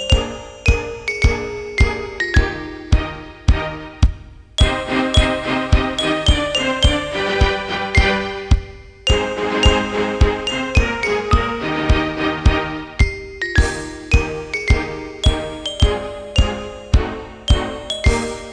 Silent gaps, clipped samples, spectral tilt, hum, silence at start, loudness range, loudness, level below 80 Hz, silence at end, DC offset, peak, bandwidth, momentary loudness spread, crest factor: none; under 0.1%; -5 dB/octave; none; 0 s; 3 LU; -19 LUFS; -20 dBFS; 0 s; under 0.1%; 0 dBFS; 10.5 kHz; 8 LU; 18 dB